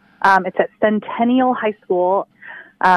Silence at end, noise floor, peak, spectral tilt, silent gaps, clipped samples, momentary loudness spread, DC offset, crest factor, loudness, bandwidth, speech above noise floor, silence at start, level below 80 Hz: 0 s; -39 dBFS; -2 dBFS; -6.5 dB/octave; none; under 0.1%; 12 LU; under 0.1%; 16 dB; -17 LUFS; 10.5 kHz; 22 dB; 0.2 s; -62 dBFS